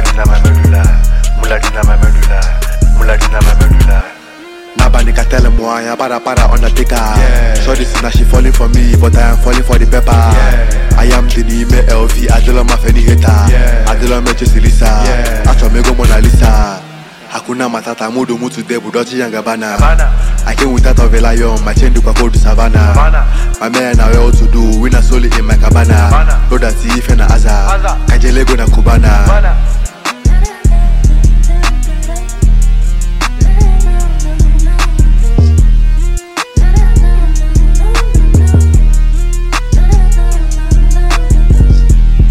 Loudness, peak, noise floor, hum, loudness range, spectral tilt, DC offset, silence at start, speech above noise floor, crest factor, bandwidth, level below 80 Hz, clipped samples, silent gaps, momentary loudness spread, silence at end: -10 LUFS; 0 dBFS; -31 dBFS; none; 3 LU; -5.5 dB/octave; under 0.1%; 0 s; 24 dB; 6 dB; 13.5 kHz; -8 dBFS; under 0.1%; none; 7 LU; 0 s